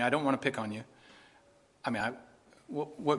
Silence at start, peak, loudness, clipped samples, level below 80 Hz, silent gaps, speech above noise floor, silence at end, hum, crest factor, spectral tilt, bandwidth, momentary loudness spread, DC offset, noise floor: 0 s; -12 dBFS; -34 LUFS; under 0.1%; -72 dBFS; none; 31 dB; 0 s; none; 24 dB; -5.5 dB/octave; 11.5 kHz; 16 LU; under 0.1%; -64 dBFS